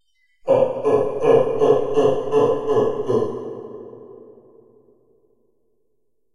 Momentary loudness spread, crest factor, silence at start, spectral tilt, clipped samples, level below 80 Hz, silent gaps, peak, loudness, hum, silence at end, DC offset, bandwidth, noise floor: 17 LU; 18 dB; 0.45 s; -7 dB/octave; under 0.1%; -56 dBFS; none; -4 dBFS; -19 LUFS; none; 2.1 s; under 0.1%; 10.5 kHz; -74 dBFS